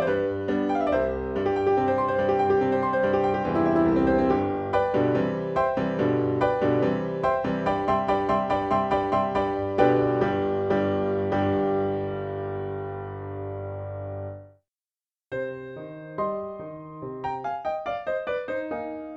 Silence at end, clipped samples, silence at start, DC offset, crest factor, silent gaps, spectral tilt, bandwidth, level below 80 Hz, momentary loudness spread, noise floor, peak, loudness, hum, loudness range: 0 s; under 0.1%; 0 s; under 0.1%; 18 dB; none; -8.5 dB/octave; 7.8 kHz; -50 dBFS; 12 LU; under -90 dBFS; -6 dBFS; -25 LUFS; none; 12 LU